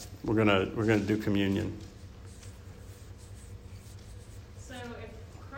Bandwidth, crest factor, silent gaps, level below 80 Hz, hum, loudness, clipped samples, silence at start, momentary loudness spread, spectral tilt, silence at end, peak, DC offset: 16 kHz; 20 dB; none; -52 dBFS; none; -29 LUFS; under 0.1%; 0 s; 22 LU; -6.5 dB/octave; 0 s; -12 dBFS; under 0.1%